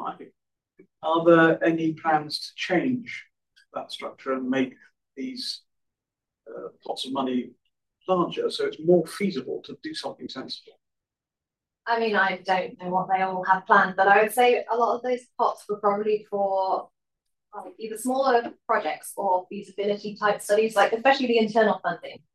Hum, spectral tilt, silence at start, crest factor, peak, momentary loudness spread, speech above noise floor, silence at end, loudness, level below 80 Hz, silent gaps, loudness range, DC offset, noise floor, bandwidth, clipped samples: none; -5 dB/octave; 0 s; 20 dB; -6 dBFS; 18 LU; 65 dB; 0.2 s; -24 LUFS; -78 dBFS; none; 10 LU; under 0.1%; -89 dBFS; 14 kHz; under 0.1%